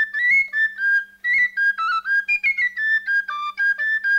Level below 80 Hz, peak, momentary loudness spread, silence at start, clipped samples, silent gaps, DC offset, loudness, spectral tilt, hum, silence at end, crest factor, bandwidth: -64 dBFS; -10 dBFS; 5 LU; 0 s; under 0.1%; none; under 0.1%; -19 LUFS; 0.5 dB/octave; none; 0 s; 10 dB; 15.5 kHz